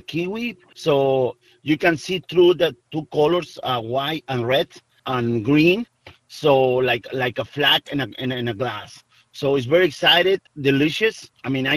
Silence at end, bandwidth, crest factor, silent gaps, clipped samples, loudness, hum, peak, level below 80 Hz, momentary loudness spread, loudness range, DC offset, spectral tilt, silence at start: 0 s; 14.5 kHz; 18 dB; none; under 0.1%; -20 LUFS; none; -2 dBFS; -56 dBFS; 11 LU; 2 LU; under 0.1%; -5.5 dB/octave; 0.1 s